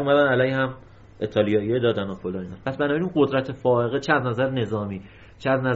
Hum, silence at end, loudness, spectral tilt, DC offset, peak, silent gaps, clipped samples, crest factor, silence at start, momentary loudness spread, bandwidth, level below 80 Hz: none; 0 s; -23 LUFS; -5 dB/octave; under 0.1%; -4 dBFS; none; under 0.1%; 18 dB; 0 s; 11 LU; 7.6 kHz; -54 dBFS